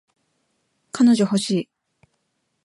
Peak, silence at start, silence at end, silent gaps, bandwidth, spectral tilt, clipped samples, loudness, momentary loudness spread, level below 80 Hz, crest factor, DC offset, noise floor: -8 dBFS; 0.95 s; 1 s; none; 11.5 kHz; -5.5 dB/octave; under 0.1%; -19 LUFS; 20 LU; -70 dBFS; 16 dB; under 0.1%; -73 dBFS